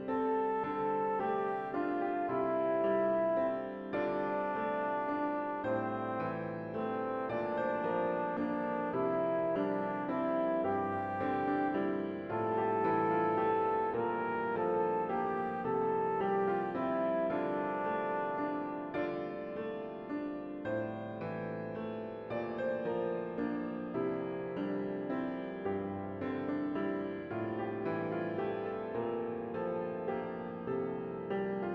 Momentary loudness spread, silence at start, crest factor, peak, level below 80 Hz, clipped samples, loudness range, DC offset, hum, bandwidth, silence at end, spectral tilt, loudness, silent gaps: 8 LU; 0 s; 16 dB; -20 dBFS; -70 dBFS; under 0.1%; 5 LU; under 0.1%; none; 5.8 kHz; 0 s; -9 dB/octave; -35 LUFS; none